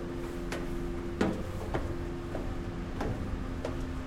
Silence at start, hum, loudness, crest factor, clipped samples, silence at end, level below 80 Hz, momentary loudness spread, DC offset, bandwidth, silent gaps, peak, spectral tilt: 0 s; none; -36 LUFS; 22 dB; under 0.1%; 0 s; -40 dBFS; 6 LU; under 0.1%; 16 kHz; none; -12 dBFS; -7 dB/octave